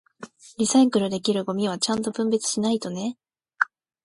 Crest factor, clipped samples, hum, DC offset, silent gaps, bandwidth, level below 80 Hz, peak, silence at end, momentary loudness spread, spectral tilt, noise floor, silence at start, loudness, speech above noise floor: 22 dB; under 0.1%; none; under 0.1%; none; 11.5 kHz; -66 dBFS; -4 dBFS; 0.4 s; 12 LU; -4 dB/octave; -45 dBFS; 0.2 s; -24 LUFS; 22 dB